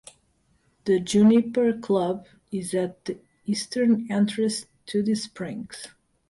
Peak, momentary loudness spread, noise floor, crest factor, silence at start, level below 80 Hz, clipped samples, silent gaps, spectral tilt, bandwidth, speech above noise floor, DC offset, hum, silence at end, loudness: -8 dBFS; 17 LU; -66 dBFS; 16 dB; 0.85 s; -64 dBFS; under 0.1%; none; -5.5 dB/octave; 11.5 kHz; 43 dB; under 0.1%; none; 0.4 s; -24 LUFS